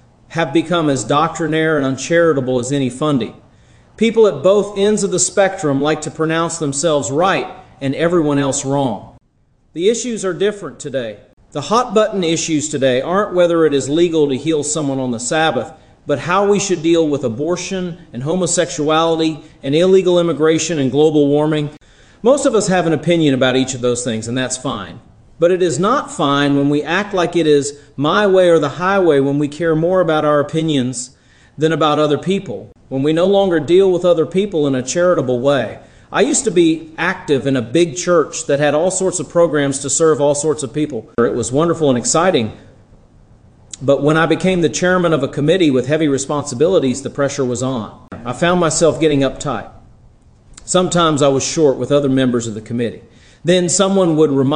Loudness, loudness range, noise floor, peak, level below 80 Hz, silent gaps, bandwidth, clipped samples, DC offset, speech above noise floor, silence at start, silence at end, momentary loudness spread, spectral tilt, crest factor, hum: -15 LUFS; 3 LU; -56 dBFS; -2 dBFS; -46 dBFS; 11.33-11.37 s; 10.5 kHz; under 0.1%; under 0.1%; 41 dB; 0.3 s; 0 s; 9 LU; -4.5 dB/octave; 14 dB; none